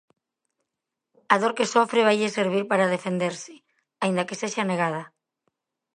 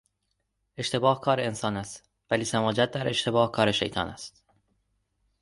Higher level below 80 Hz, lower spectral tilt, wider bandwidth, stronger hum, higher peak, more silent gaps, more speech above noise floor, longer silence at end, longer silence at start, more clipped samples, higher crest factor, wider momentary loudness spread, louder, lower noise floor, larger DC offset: second, -78 dBFS vs -58 dBFS; about the same, -4.5 dB/octave vs -4.5 dB/octave; about the same, 10.5 kHz vs 11.5 kHz; second, none vs 50 Hz at -55 dBFS; first, -2 dBFS vs -8 dBFS; neither; first, 62 dB vs 51 dB; second, 0.9 s vs 1.15 s; first, 1.3 s vs 0.8 s; neither; about the same, 24 dB vs 20 dB; second, 9 LU vs 17 LU; first, -24 LUFS vs -27 LUFS; first, -85 dBFS vs -78 dBFS; neither